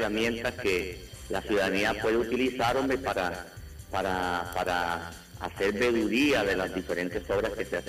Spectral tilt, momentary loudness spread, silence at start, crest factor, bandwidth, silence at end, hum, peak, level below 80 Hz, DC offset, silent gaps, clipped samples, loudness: -4.5 dB/octave; 12 LU; 0 s; 12 dB; 15.5 kHz; 0 s; none; -16 dBFS; -48 dBFS; under 0.1%; none; under 0.1%; -28 LUFS